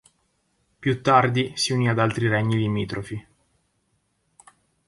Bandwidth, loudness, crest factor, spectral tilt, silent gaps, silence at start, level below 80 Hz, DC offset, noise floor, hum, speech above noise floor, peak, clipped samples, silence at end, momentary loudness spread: 11.5 kHz; -22 LUFS; 22 dB; -5.5 dB/octave; none; 0.8 s; -56 dBFS; under 0.1%; -70 dBFS; none; 48 dB; -4 dBFS; under 0.1%; 1.65 s; 13 LU